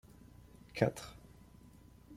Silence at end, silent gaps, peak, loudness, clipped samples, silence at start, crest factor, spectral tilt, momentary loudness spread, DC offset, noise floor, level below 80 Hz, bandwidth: 0 s; none; -14 dBFS; -37 LUFS; under 0.1%; 0.75 s; 28 dB; -6 dB/octave; 25 LU; under 0.1%; -59 dBFS; -62 dBFS; 16 kHz